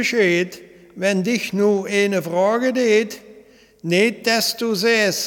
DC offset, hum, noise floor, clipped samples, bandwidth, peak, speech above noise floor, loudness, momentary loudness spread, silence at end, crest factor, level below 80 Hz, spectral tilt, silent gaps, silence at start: under 0.1%; none; -48 dBFS; under 0.1%; 19 kHz; -2 dBFS; 30 dB; -19 LUFS; 6 LU; 0 s; 16 dB; -66 dBFS; -4 dB/octave; none; 0 s